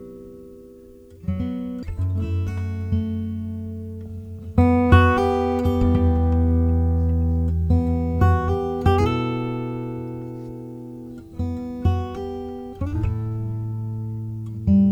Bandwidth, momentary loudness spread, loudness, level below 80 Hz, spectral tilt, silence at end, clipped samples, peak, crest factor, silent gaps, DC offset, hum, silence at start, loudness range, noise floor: 6.6 kHz; 16 LU; -22 LUFS; -30 dBFS; -9 dB/octave; 0 s; under 0.1%; -2 dBFS; 20 dB; none; under 0.1%; none; 0 s; 9 LU; -45 dBFS